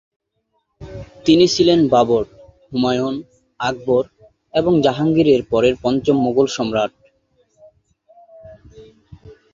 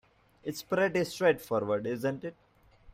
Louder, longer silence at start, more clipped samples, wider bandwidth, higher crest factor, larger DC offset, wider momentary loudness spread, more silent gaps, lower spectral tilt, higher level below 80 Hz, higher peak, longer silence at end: first, -17 LUFS vs -31 LUFS; first, 0.8 s vs 0.45 s; neither; second, 7.6 kHz vs 16 kHz; about the same, 18 dB vs 18 dB; neither; about the same, 14 LU vs 13 LU; neither; about the same, -5.5 dB/octave vs -5.5 dB/octave; first, -48 dBFS vs -66 dBFS; first, -2 dBFS vs -14 dBFS; first, 0.2 s vs 0.05 s